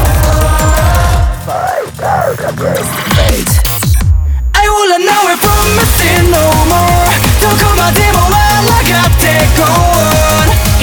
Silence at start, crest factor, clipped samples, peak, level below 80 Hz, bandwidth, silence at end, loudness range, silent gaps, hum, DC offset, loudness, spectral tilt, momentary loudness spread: 0 s; 8 dB; 0.1%; 0 dBFS; -14 dBFS; over 20 kHz; 0 s; 4 LU; none; none; under 0.1%; -9 LUFS; -4 dB/octave; 6 LU